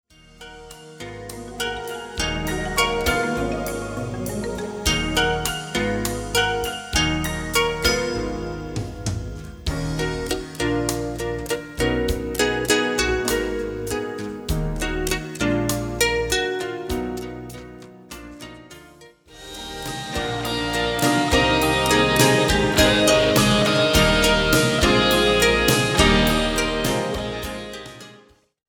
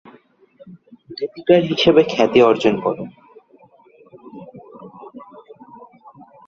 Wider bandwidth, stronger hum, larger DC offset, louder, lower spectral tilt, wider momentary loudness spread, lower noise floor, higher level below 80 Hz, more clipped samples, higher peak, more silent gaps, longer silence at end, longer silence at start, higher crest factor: first, over 20 kHz vs 7.6 kHz; neither; neither; second, -21 LUFS vs -16 LUFS; second, -3.5 dB/octave vs -6 dB/octave; second, 18 LU vs 26 LU; about the same, -52 dBFS vs -51 dBFS; first, -34 dBFS vs -58 dBFS; neither; about the same, -2 dBFS vs 0 dBFS; neither; second, 0.5 s vs 1.1 s; second, 0.4 s vs 0.65 s; about the same, 20 dB vs 20 dB